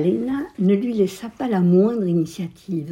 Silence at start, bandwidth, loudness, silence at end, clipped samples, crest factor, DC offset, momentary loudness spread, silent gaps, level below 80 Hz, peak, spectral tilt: 0 s; 12 kHz; -21 LUFS; 0 s; under 0.1%; 14 dB; under 0.1%; 11 LU; none; -58 dBFS; -6 dBFS; -8.5 dB/octave